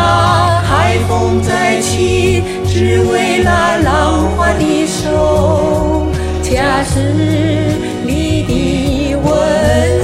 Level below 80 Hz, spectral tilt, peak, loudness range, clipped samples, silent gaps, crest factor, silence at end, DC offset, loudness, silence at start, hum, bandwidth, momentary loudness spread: -24 dBFS; -5.5 dB/octave; 0 dBFS; 2 LU; under 0.1%; none; 12 dB; 0 s; 0.2%; -12 LUFS; 0 s; none; 15.5 kHz; 4 LU